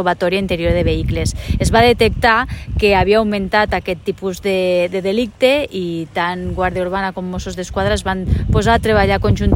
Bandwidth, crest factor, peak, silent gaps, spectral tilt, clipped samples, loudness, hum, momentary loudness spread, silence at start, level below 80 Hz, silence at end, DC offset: 16.5 kHz; 16 dB; 0 dBFS; none; -5.5 dB/octave; under 0.1%; -16 LUFS; none; 9 LU; 0 s; -26 dBFS; 0 s; under 0.1%